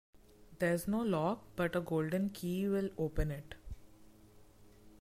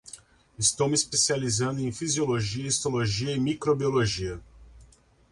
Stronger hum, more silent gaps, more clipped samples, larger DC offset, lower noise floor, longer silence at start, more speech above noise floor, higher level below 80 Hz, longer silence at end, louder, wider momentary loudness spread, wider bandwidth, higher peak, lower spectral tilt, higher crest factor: neither; neither; neither; neither; about the same, -60 dBFS vs -57 dBFS; about the same, 0.15 s vs 0.05 s; second, 25 dB vs 31 dB; about the same, -50 dBFS vs -52 dBFS; second, 0.1 s vs 0.5 s; second, -36 LUFS vs -26 LUFS; first, 16 LU vs 9 LU; first, 16 kHz vs 11.5 kHz; second, -22 dBFS vs -10 dBFS; first, -7 dB/octave vs -3.5 dB/octave; about the same, 16 dB vs 18 dB